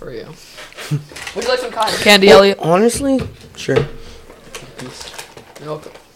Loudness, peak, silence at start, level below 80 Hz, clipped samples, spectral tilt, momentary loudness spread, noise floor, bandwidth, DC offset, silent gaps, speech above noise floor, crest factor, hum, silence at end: -13 LUFS; 0 dBFS; 0 s; -42 dBFS; under 0.1%; -4 dB/octave; 26 LU; -37 dBFS; 16.5 kHz; under 0.1%; none; 23 dB; 16 dB; none; 0.25 s